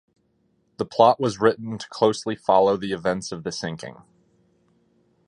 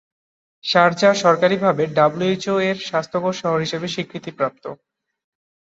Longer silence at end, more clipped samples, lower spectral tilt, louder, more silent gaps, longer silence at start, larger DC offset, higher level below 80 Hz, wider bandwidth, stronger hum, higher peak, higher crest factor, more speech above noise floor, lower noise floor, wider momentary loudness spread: first, 1.35 s vs 0.9 s; neither; about the same, -5 dB/octave vs -5 dB/octave; second, -22 LUFS vs -19 LUFS; neither; first, 0.8 s vs 0.65 s; neither; about the same, -60 dBFS vs -64 dBFS; first, 11 kHz vs 8 kHz; neither; about the same, -2 dBFS vs -2 dBFS; about the same, 22 dB vs 18 dB; second, 45 dB vs over 71 dB; second, -67 dBFS vs under -90 dBFS; first, 15 LU vs 12 LU